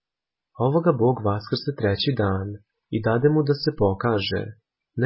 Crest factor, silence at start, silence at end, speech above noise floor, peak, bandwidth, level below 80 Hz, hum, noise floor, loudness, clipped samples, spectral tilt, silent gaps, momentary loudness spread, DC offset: 18 dB; 0.6 s; 0 s; 66 dB; -4 dBFS; 5.8 kHz; -46 dBFS; none; -88 dBFS; -23 LUFS; under 0.1%; -11 dB/octave; none; 11 LU; under 0.1%